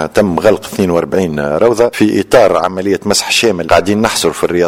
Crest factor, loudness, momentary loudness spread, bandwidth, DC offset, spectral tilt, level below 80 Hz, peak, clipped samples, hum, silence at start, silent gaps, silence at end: 12 dB; -11 LUFS; 5 LU; 17 kHz; under 0.1%; -4 dB/octave; -40 dBFS; 0 dBFS; 0.6%; none; 0 s; none; 0 s